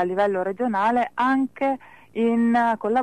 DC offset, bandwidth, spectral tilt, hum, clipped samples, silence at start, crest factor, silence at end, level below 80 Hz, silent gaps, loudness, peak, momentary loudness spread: 0.2%; 9.4 kHz; -7 dB/octave; none; under 0.1%; 0 s; 10 dB; 0 s; -64 dBFS; none; -22 LUFS; -12 dBFS; 6 LU